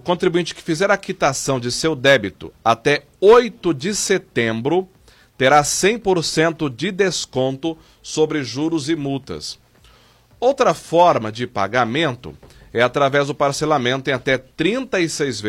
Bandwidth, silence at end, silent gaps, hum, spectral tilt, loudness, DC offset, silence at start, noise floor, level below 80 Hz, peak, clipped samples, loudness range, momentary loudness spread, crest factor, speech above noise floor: 16 kHz; 0 s; none; none; -4 dB/octave; -18 LUFS; under 0.1%; 0.05 s; -51 dBFS; -50 dBFS; -2 dBFS; under 0.1%; 5 LU; 11 LU; 16 dB; 33 dB